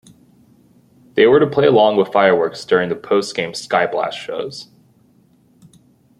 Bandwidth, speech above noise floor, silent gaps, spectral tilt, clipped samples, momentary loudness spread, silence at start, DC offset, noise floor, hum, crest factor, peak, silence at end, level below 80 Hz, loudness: 12 kHz; 38 dB; none; -5 dB/octave; under 0.1%; 13 LU; 1.15 s; under 0.1%; -54 dBFS; none; 16 dB; -2 dBFS; 1.55 s; -62 dBFS; -16 LUFS